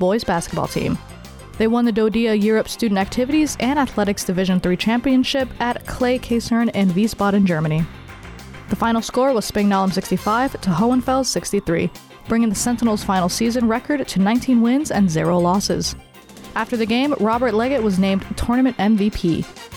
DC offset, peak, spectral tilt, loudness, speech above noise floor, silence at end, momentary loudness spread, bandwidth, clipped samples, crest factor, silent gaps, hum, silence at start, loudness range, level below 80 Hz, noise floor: under 0.1%; -8 dBFS; -5.5 dB/octave; -19 LUFS; 22 dB; 0 s; 6 LU; 18.5 kHz; under 0.1%; 10 dB; none; none; 0 s; 2 LU; -40 dBFS; -40 dBFS